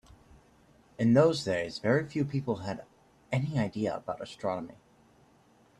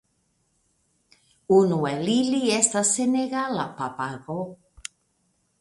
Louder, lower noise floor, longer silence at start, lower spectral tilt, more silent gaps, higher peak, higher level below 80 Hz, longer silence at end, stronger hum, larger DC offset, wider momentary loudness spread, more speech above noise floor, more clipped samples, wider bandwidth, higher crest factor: second, -30 LUFS vs -23 LUFS; second, -63 dBFS vs -70 dBFS; second, 1 s vs 1.5 s; first, -7 dB/octave vs -4 dB/octave; neither; second, -10 dBFS vs -4 dBFS; about the same, -64 dBFS vs -64 dBFS; about the same, 1.05 s vs 1.05 s; neither; neither; second, 15 LU vs 19 LU; second, 33 dB vs 47 dB; neither; about the same, 11.5 kHz vs 11.5 kHz; about the same, 20 dB vs 22 dB